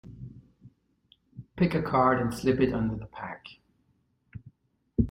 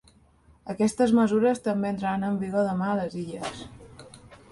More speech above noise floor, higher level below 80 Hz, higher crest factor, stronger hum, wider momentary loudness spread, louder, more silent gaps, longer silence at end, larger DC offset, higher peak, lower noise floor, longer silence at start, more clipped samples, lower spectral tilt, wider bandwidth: first, 44 dB vs 33 dB; first, -48 dBFS vs -58 dBFS; about the same, 20 dB vs 16 dB; neither; first, 25 LU vs 19 LU; about the same, -27 LUFS vs -26 LUFS; neither; second, 0 s vs 0.15 s; neither; about the same, -10 dBFS vs -10 dBFS; first, -71 dBFS vs -58 dBFS; second, 0.05 s vs 0.65 s; neither; about the same, -7.5 dB/octave vs -6.5 dB/octave; first, 16 kHz vs 11.5 kHz